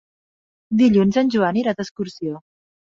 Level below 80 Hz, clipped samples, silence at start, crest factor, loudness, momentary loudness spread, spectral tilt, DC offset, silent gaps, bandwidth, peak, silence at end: -56 dBFS; under 0.1%; 0.7 s; 16 dB; -19 LUFS; 15 LU; -7 dB/octave; under 0.1%; 1.91-1.96 s; 7.6 kHz; -6 dBFS; 0.55 s